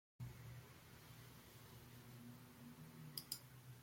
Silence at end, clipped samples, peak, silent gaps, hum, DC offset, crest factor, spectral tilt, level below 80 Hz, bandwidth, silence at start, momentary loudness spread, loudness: 0 s; under 0.1%; -28 dBFS; none; none; under 0.1%; 30 dB; -3.5 dB/octave; -74 dBFS; 16.5 kHz; 0.2 s; 10 LU; -57 LUFS